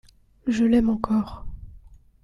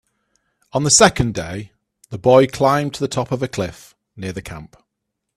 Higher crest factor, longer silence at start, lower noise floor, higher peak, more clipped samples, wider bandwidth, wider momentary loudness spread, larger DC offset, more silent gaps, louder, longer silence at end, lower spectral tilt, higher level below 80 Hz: about the same, 18 dB vs 20 dB; second, 0.45 s vs 0.75 s; second, -48 dBFS vs -78 dBFS; second, -6 dBFS vs 0 dBFS; neither; second, 10.5 kHz vs 14.5 kHz; about the same, 20 LU vs 20 LU; neither; neither; second, -23 LUFS vs -17 LUFS; second, 0.3 s vs 0.7 s; first, -7 dB/octave vs -4 dB/octave; about the same, -42 dBFS vs -44 dBFS